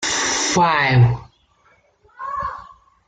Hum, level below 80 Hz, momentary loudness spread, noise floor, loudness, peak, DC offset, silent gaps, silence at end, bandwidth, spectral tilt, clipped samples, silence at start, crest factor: none; -46 dBFS; 16 LU; -58 dBFS; -18 LUFS; -4 dBFS; under 0.1%; none; 0.45 s; 9.4 kHz; -3.5 dB/octave; under 0.1%; 0 s; 16 dB